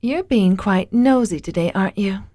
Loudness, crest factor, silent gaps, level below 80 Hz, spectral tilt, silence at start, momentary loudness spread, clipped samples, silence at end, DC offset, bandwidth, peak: -18 LUFS; 14 dB; none; -44 dBFS; -7 dB/octave; 0 s; 6 LU; under 0.1%; 0.1 s; under 0.1%; 11 kHz; -4 dBFS